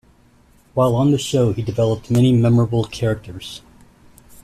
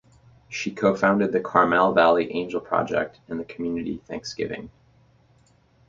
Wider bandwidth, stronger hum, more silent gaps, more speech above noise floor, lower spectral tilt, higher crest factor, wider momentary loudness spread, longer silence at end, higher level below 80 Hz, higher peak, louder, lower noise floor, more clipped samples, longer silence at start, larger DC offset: first, 13.5 kHz vs 7.6 kHz; neither; neither; about the same, 35 dB vs 36 dB; first, -7 dB/octave vs -5.5 dB/octave; second, 14 dB vs 22 dB; about the same, 17 LU vs 15 LU; second, 0.85 s vs 1.2 s; first, -46 dBFS vs -58 dBFS; second, -6 dBFS vs -2 dBFS; first, -18 LUFS vs -23 LUFS; second, -52 dBFS vs -59 dBFS; neither; first, 0.75 s vs 0.5 s; neither